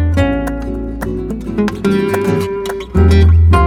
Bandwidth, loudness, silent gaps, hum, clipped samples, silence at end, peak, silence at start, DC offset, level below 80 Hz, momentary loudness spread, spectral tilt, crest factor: 13.5 kHz; -15 LUFS; none; none; under 0.1%; 0 s; 0 dBFS; 0 s; under 0.1%; -18 dBFS; 12 LU; -8 dB/octave; 12 dB